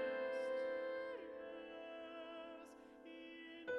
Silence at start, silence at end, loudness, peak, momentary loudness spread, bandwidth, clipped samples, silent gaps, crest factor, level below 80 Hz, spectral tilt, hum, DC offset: 0 s; 0 s; -47 LUFS; -32 dBFS; 15 LU; 11 kHz; under 0.1%; none; 16 dB; -84 dBFS; -4 dB/octave; none; under 0.1%